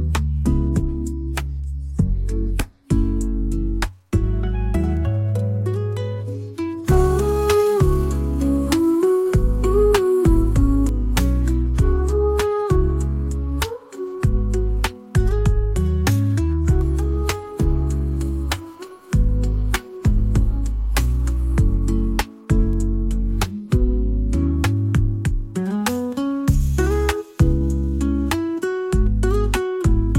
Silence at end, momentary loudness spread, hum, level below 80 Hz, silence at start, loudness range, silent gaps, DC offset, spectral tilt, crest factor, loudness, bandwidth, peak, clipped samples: 0 s; 8 LU; none; -22 dBFS; 0 s; 5 LU; none; under 0.1%; -7 dB/octave; 14 dB; -21 LUFS; 16.5 kHz; -4 dBFS; under 0.1%